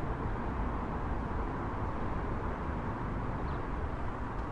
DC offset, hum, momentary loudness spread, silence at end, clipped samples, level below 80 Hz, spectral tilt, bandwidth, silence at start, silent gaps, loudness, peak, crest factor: under 0.1%; none; 2 LU; 0 s; under 0.1%; -40 dBFS; -8.5 dB/octave; 8.4 kHz; 0 s; none; -37 LUFS; -22 dBFS; 12 dB